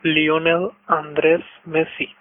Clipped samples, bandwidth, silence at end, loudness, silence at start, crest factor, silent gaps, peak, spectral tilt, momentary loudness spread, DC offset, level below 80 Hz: under 0.1%; 3.8 kHz; 0.1 s; -19 LUFS; 0.05 s; 18 dB; none; -2 dBFS; -10 dB/octave; 6 LU; under 0.1%; -60 dBFS